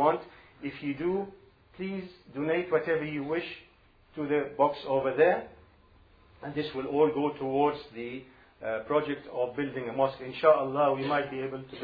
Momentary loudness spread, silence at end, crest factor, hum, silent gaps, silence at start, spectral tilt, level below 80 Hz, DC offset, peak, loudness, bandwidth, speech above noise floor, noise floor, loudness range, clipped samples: 16 LU; 0 s; 20 dB; none; none; 0 s; -9 dB/octave; -64 dBFS; under 0.1%; -10 dBFS; -30 LUFS; 5 kHz; 30 dB; -59 dBFS; 4 LU; under 0.1%